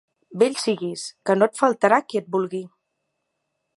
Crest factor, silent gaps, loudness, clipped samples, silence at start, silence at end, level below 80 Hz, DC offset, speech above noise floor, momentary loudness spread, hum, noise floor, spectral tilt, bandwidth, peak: 22 dB; none; -22 LUFS; under 0.1%; 0.3 s; 1.1 s; -78 dBFS; under 0.1%; 56 dB; 11 LU; none; -77 dBFS; -4.5 dB/octave; 11.5 kHz; -2 dBFS